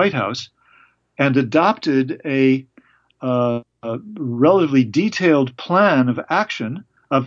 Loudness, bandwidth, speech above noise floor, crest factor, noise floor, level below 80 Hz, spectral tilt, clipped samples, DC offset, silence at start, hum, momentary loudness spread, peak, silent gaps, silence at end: -18 LUFS; 7.4 kHz; 37 dB; 16 dB; -54 dBFS; -68 dBFS; -7 dB/octave; under 0.1%; under 0.1%; 0 s; none; 14 LU; -2 dBFS; none; 0 s